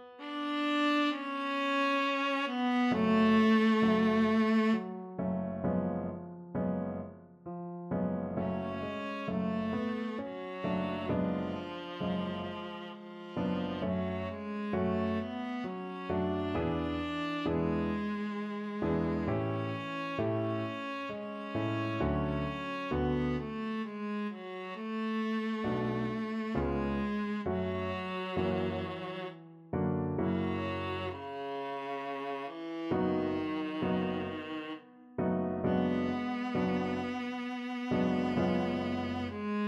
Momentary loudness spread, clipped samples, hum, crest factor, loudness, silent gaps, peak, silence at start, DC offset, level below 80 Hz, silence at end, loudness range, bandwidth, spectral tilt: 11 LU; under 0.1%; none; 16 dB; -33 LUFS; none; -18 dBFS; 0 s; under 0.1%; -54 dBFS; 0 s; 8 LU; 8 kHz; -7.5 dB/octave